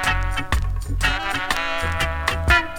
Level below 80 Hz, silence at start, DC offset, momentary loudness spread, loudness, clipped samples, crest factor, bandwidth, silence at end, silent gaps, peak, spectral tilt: -26 dBFS; 0 s; under 0.1%; 6 LU; -22 LUFS; under 0.1%; 22 dB; 18.5 kHz; 0 s; none; 0 dBFS; -3.5 dB/octave